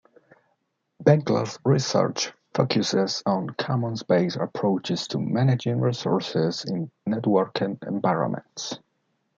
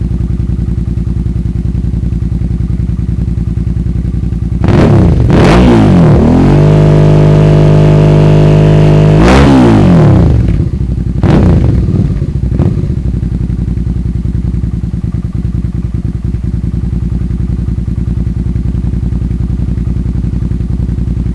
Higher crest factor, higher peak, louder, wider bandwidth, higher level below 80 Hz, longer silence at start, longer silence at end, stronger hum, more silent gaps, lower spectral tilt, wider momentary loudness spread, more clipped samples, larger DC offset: first, 22 dB vs 6 dB; second, -4 dBFS vs 0 dBFS; second, -25 LUFS vs -9 LUFS; second, 7.6 kHz vs 11 kHz; second, -68 dBFS vs -16 dBFS; first, 1 s vs 0 s; first, 0.6 s vs 0 s; neither; neither; second, -6 dB/octave vs -8.5 dB/octave; about the same, 8 LU vs 10 LU; neither; second, under 0.1% vs 1%